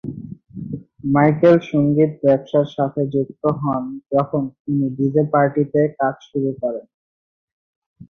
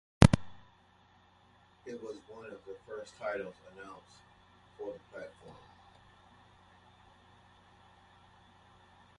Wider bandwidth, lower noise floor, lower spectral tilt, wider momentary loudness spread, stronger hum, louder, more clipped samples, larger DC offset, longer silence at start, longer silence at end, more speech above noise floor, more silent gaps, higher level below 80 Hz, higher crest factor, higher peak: second, 6.6 kHz vs 11.5 kHz; first, under -90 dBFS vs -64 dBFS; first, -10 dB/octave vs -6.5 dB/octave; second, 16 LU vs 30 LU; neither; first, -19 LUFS vs -34 LUFS; neither; neither; second, 0.05 s vs 0.2 s; second, 0.05 s vs 3.65 s; first, over 72 dB vs 19 dB; first, 4.60-4.65 s, 6.94-7.96 s vs none; second, -56 dBFS vs -48 dBFS; second, 18 dB vs 36 dB; about the same, -2 dBFS vs -2 dBFS